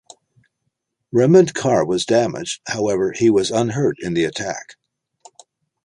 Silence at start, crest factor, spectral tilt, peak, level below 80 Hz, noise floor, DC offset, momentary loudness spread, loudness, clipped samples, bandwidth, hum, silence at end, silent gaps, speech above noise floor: 1.15 s; 18 dB; -5.5 dB/octave; -2 dBFS; -56 dBFS; -75 dBFS; under 0.1%; 12 LU; -18 LUFS; under 0.1%; 11 kHz; none; 1.15 s; none; 57 dB